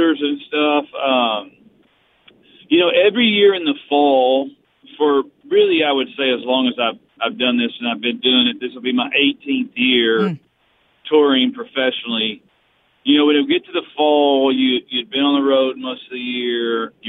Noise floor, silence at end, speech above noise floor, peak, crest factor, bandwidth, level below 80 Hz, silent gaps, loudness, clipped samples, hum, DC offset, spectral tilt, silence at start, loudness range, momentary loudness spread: -60 dBFS; 0 s; 43 dB; -2 dBFS; 14 dB; 4.1 kHz; -72 dBFS; none; -17 LUFS; under 0.1%; none; under 0.1%; -7.5 dB/octave; 0 s; 2 LU; 9 LU